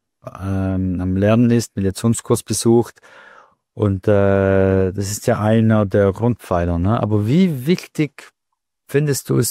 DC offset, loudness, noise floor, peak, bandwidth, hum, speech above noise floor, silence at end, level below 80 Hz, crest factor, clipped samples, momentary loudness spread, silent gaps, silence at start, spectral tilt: under 0.1%; -18 LUFS; -78 dBFS; -4 dBFS; 16 kHz; none; 61 dB; 0 s; -44 dBFS; 14 dB; under 0.1%; 8 LU; none; 0.25 s; -6.5 dB/octave